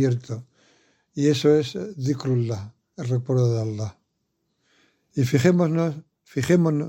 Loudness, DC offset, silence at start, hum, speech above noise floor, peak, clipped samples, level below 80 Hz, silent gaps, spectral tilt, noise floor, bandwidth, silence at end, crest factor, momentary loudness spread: -23 LUFS; under 0.1%; 0 s; none; 53 dB; -4 dBFS; under 0.1%; -62 dBFS; none; -7 dB/octave; -75 dBFS; 16.5 kHz; 0 s; 20 dB; 15 LU